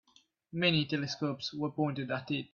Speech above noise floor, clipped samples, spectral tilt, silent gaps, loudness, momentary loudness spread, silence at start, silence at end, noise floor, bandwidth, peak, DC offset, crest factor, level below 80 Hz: 34 dB; under 0.1%; -5.5 dB/octave; none; -33 LUFS; 8 LU; 0.55 s; 0.1 s; -67 dBFS; 7.2 kHz; -14 dBFS; under 0.1%; 20 dB; -70 dBFS